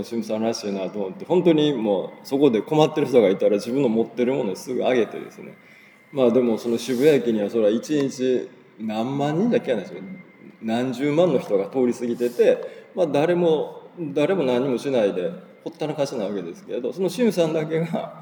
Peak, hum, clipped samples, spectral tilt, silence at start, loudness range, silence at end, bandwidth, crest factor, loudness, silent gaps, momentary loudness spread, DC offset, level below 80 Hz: -2 dBFS; none; under 0.1%; -6.5 dB/octave; 0 s; 4 LU; 0 s; over 20 kHz; 20 dB; -22 LUFS; none; 13 LU; under 0.1%; -80 dBFS